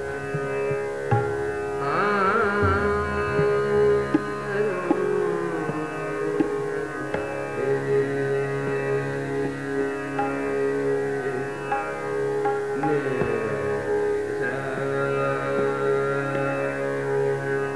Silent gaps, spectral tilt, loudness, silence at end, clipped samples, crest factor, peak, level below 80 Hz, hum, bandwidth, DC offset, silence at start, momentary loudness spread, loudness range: none; -7 dB/octave; -25 LUFS; 0 s; under 0.1%; 16 dB; -8 dBFS; -50 dBFS; none; 11 kHz; 0.4%; 0 s; 7 LU; 4 LU